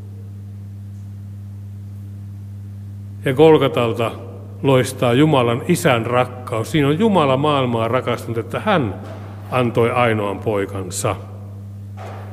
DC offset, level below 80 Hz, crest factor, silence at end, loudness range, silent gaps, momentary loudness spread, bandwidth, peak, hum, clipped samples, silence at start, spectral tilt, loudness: under 0.1%; -54 dBFS; 18 dB; 0 s; 5 LU; none; 19 LU; 16 kHz; 0 dBFS; none; under 0.1%; 0 s; -6 dB/octave; -18 LUFS